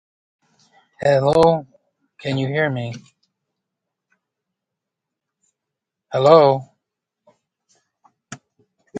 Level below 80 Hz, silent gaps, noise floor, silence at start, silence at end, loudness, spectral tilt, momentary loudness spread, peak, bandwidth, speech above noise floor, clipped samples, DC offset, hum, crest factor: -58 dBFS; none; -83 dBFS; 1 s; 0 s; -17 LUFS; -6.5 dB/octave; 28 LU; 0 dBFS; 10.5 kHz; 67 dB; under 0.1%; under 0.1%; none; 22 dB